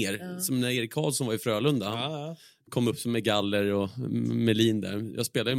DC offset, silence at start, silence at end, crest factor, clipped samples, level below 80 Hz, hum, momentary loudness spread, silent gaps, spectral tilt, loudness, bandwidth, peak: under 0.1%; 0 s; 0 s; 18 dB; under 0.1%; -66 dBFS; none; 8 LU; none; -5 dB/octave; -28 LUFS; 16.5 kHz; -10 dBFS